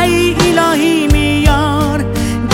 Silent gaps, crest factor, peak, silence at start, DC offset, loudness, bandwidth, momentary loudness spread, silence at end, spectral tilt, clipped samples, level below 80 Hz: none; 12 dB; 0 dBFS; 0 s; under 0.1%; -12 LUFS; 16.5 kHz; 5 LU; 0 s; -5 dB/octave; under 0.1%; -20 dBFS